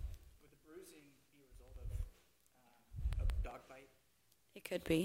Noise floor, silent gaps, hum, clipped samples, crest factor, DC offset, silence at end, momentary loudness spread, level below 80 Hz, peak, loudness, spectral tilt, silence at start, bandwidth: -76 dBFS; none; none; under 0.1%; 22 dB; under 0.1%; 0 s; 24 LU; -48 dBFS; -24 dBFS; -46 LUFS; -6 dB/octave; 0 s; 16 kHz